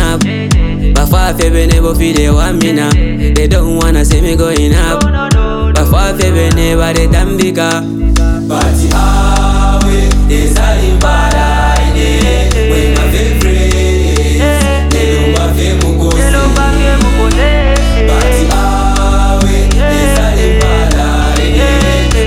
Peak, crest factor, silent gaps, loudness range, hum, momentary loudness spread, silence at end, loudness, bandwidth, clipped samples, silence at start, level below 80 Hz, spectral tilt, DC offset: 0 dBFS; 8 dB; none; 1 LU; none; 2 LU; 0 s; -10 LUFS; 15.5 kHz; under 0.1%; 0 s; -10 dBFS; -5.5 dB/octave; under 0.1%